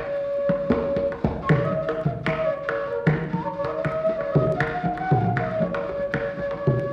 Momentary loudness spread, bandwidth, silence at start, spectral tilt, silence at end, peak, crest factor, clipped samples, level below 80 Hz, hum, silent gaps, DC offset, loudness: 5 LU; 7.2 kHz; 0 s; -9 dB/octave; 0 s; -6 dBFS; 18 dB; under 0.1%; -44 dBFS; none; none; under 0.1%; -24 LUFS